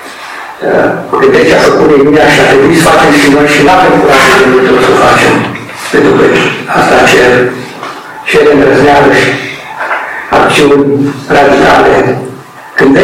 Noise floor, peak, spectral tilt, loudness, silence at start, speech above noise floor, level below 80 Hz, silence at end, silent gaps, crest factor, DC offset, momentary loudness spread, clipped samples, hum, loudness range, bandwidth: -25 dBFS; 0 dBFS; -4.5 dB/octave; -5 LUFS; 0 s; 21 dB; -34 dBFS; 0 s; none; 6 dB; under 0.1%; 13 LU; 2%; none; 3 LU; 16.5 kHz